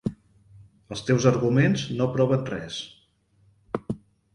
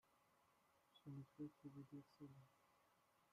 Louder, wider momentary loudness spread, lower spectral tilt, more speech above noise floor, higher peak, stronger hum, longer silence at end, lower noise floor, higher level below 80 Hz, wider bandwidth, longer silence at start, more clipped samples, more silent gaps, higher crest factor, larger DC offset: first, -25 LUFS vs -60 LUFS; first, 16 LU vs 7 LU; about the same, -6.5 dB/octave vs -7.5 dB/octave; first, 40 dB vs 20 dB; first, -4 dBFS vs -44 dBFS; neither; first, 0.35 s vs 0 s; second, -63 dBFS vs -80 dBFS; first, -56 dBFS vs under -90 dBFS; second, 10.5 kHz vs 14.5 kHz; about the same, 0.05 s vs 0.05 s; neither; neither; about the same, 22 dB vs 18 dB; neither